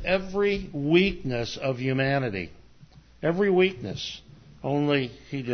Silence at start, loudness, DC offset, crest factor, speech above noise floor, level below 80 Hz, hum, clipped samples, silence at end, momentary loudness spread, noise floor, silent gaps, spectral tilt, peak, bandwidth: 0 s; -26 LUFS; under 0.1%; 18 dB; 27 dB; -48 dBFS; none; under 0.1%; 0 s; 13 LU; -52 dBFS; none; -6.5 dB/octave; -8 dBFS; 6.6 kHz